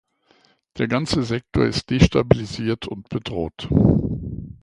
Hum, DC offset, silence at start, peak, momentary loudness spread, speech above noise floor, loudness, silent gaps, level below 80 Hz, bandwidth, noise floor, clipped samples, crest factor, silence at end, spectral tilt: none; under 0.1%; 0.75 s; 0 dBFS; 12 LU; 39 dB; -21 LUFS; none; -34 dBFS; 11 kHz; -59 dBFS; under 0.1%; 22 dB; 0.1 s; -6.5 dB/octave